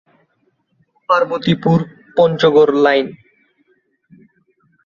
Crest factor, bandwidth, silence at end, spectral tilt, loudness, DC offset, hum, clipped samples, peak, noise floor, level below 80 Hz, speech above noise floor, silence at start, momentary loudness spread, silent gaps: 16 dB; 7.2 kHz; 1.7 s; -7.5 dB/octave; -14 LUFS; under 0.1%; none; under 0.1%; -2 dBFS; -63 dBFS; -56 dBFS; 50 dB; 1.1 s; 9 LU; none